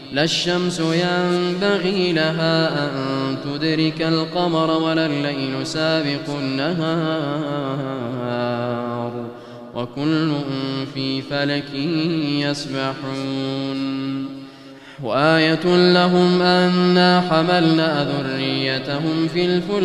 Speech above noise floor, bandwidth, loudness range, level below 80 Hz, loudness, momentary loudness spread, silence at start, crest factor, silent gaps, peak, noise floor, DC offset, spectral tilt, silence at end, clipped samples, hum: 21 dB; 11.5 kHz; 8 LU; -58 dBFS; -20 LUFS; 10 LU; 0 s; 18 dB; none; -2 dBFS; -40 dBFS; under 0.1%; -6 dB/octave; 0 s; under 0.1%; none